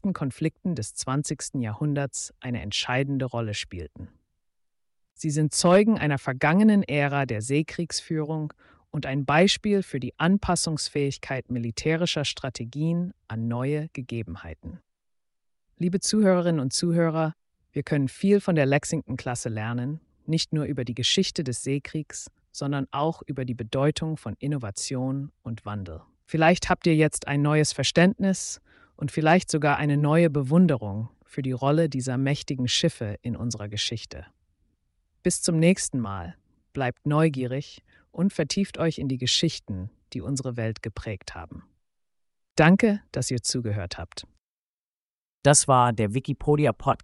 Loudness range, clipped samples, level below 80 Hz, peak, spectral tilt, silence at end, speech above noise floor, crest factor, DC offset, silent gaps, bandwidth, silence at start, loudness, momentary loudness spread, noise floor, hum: 6 LU; under 0.1%; -52 dBFS; -4 dBFS; -5 dB/octave; 0.05 s; over 65 dB; 20 dB; under 0.1%; 42.51-42.55 s, 44.40-45.42 s; 11.5 kHz; 0.05 s; -25 LUFS; 15 LU; under -90 dBFS; none